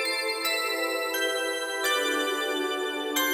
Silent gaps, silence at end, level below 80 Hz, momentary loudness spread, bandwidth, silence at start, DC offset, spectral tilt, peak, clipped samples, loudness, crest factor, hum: none; 0 s; -72 dBFS; 3 LU; 17 kHz; 0 s; under 0.1%; 0.5 dB/octave; -12 dBFS; under 0.1%; -27 LUFS; 16 dB; none